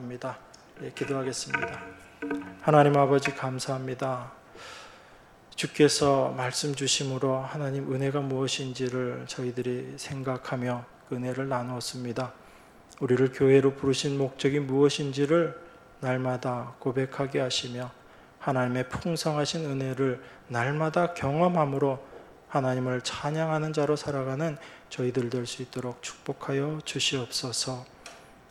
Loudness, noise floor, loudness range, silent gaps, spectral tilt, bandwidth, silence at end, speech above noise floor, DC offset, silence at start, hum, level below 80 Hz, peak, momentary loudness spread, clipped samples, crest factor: -28 LUFS; -54 dBFS; 6 LU; none; -5 dB/octave; 13.5 kHz; 0.15 s; 26 dB; under 0.1%; 0 s; none; -62 dBFS; -8 dBFS; 14 LU; under 0.1%; 20 dB